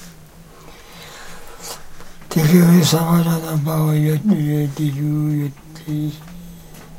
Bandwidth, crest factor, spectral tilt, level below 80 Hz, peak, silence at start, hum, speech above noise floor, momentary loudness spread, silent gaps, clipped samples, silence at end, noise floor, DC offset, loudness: 16.5 kHz; 18 dB; -6.5 dB/octave; -44 dBFS; -2 dBFS; 0 s; none; 26 dB; 24 LU; none; under 0.1%; 0 s; -42 dBFS; under 0.1%; -17 LUFS